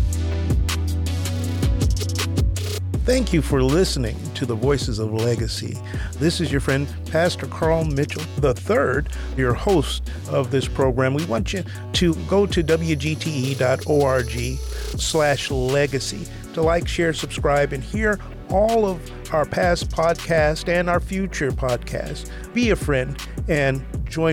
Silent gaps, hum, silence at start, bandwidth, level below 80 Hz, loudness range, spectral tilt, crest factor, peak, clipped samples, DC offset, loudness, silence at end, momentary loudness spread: none; none; 0 s; 17.5 kHz; -30 dBFS; 2 LU; -5.5 dB/octave; 14 dB; -6 dBFS; under 0.1%; under 0.1%; -22 LUFS; 0 s; 8 LU